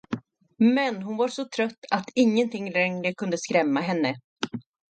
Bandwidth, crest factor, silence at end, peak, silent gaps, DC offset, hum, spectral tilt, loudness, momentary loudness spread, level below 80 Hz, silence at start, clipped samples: 9 kHz; 20 dB; 0.3 s; -6 dBFS; 1.78-1.82 s, 4.24-4.36 s; under 0.1%; none; -5 dB/octave; -25 LUFS; 12 LU; -70 dBFS; 0.1 s; under 0.1%